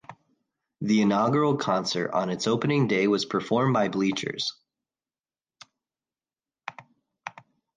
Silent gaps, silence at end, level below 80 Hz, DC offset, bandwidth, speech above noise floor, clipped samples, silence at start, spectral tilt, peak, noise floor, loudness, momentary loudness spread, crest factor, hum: none; 0.45 s; -70 dBFS; under 0.1%; 9.6 kHz; over 66 dB; under 0.1%; 0.1 s; -5.5 dB/octave; -10 dBFS; under -90 dBFS; -25 LUFS; 19 LU; 16 dB; none